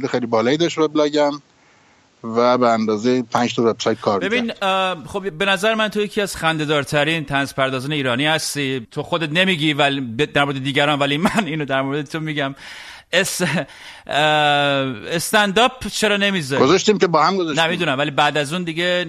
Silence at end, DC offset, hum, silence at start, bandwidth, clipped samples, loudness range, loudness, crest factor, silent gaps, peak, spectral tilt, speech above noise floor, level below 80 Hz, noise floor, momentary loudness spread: 0 s; under 0.1%; none; 0 s; 13.5 kHz; under 0.1%; 3 LU; -18 LUFS; 18 dB; none; 0 dBFS; -4 dB/octave; 35 dB; -52 dBFS; -54 dBFS; 8 LU